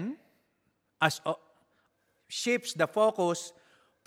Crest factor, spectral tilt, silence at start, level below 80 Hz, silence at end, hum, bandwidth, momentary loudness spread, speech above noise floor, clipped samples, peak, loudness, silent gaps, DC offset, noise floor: 26 dB; -4 dB/octave; 0 s; -80 dBFS; 0.55 s; none; 16.5 kHz; 14 LU; 47 dB; under 0.1%; -8 dBFS; -30 LUFS; none; under 0.1%; -76 dBFS